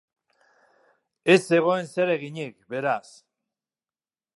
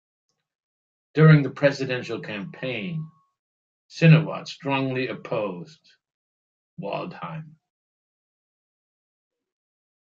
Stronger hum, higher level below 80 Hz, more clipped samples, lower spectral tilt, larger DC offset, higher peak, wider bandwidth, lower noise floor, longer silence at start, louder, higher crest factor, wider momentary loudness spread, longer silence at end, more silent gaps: neither; second, -78 dBFS vs -68 dBFS; neither; second, -5.5 dB/octave vs -8 dB/octave; neither; about the same, -4 dBFS vs -4 dBFS; first, 11.5 kHz vs 7.2 kHz; about the same, under -90 dBFS vs under -90 dBFS; about the same, 1.25 s vs 1.15 s; about the same, -24 LUFS vs -23 LUFS; about the same, 22 dB vs 22 dB; second, 15 LU vs 20 LU; second, 1.4 s vs 2.65 s; second, none vs 3.39-3.89 s, 6.14-6.77 s